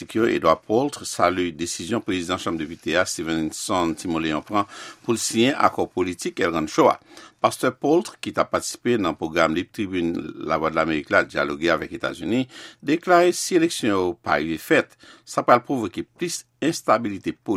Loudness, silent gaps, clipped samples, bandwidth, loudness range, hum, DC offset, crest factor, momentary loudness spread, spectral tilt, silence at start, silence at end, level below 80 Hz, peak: -23 LUFS; none; under 0.1%; 15.5 kHz; 3 LU; none; under 0.1%; 22 dB; 9 LU; -4 dB/octave; 0 s; 0 s; -54 dBFS; 0 dBFS